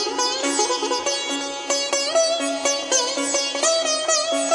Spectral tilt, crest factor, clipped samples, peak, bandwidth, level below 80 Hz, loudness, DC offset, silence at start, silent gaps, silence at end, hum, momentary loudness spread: 1 dB/octave; 16 dB; under 0.1%; -6 dBFS; 11.5 kHz; -68 dBFS; -20 LUFS; under 0.1%; 0 s; none; 0 s; none; 4 LU